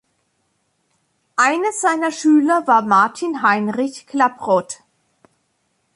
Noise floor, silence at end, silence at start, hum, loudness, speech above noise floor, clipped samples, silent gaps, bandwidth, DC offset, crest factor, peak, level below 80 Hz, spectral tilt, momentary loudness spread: -68 dBFS; 1.2 s; 1.4 s; none; -17 LUFS; 51 dB; under 0.1%; none; 11.5 kHz; under 0.1%; 16 dB; -2 dBFS; -70 dBFS; -4 dB/octave; 10 LU